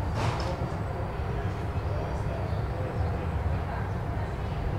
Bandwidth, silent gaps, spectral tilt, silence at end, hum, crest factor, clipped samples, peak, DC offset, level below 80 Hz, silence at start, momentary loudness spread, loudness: 12 kHz; none; -7.5 dB/octave; 0 s; none; 14 dB; under 0.1%; -16 dBFS; 0.2%; -36 dBFS; 0 s; 3 LU; -32 LUFS